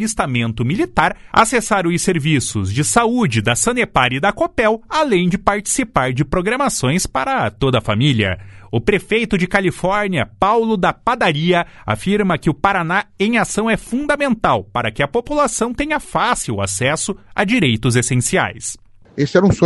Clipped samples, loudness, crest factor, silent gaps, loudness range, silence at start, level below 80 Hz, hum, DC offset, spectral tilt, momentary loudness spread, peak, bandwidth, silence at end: under 0.1%; -17 LUFS; 16 dB; none; 2 LU; 0 s; -38 dBFS; none; under 0.1%; -4.5 dB/octave; 5 LU; 0 dBFS; 12 kHz; 0 s